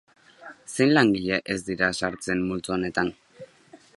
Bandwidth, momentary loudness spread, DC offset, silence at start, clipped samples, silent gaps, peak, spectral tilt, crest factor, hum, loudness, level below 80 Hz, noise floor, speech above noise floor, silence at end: 11.5 kHz; 11 LU; under 0.1%; 0.4 s; under 0.1%; none; -4 dBFS; -5 dB/octave; 22 dB; none; -24 LUFS; -56 dBFS; -53 dBFS; 29 dB; 0.25 s